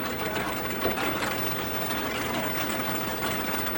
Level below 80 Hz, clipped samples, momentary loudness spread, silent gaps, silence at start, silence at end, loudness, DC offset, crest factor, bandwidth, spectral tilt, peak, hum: -50 dBFS; under 0.1%; 2 LU; none; 0 s; 0 s; -28 LUFS; under 0.1%; 18 dB; 16.5 kHz; -3.5 dB/octave; -10 dBFS; none